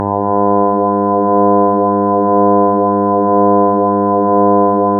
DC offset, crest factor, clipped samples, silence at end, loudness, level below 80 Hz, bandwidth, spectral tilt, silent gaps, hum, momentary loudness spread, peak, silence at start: under 0.1%; 10 dB; under 0.1%; 0 s; -12 LUFS; -62 dBFS; 2.1 kHz; -14 dB/octave; none; none; 3 LU; 0 dBFS; 0 s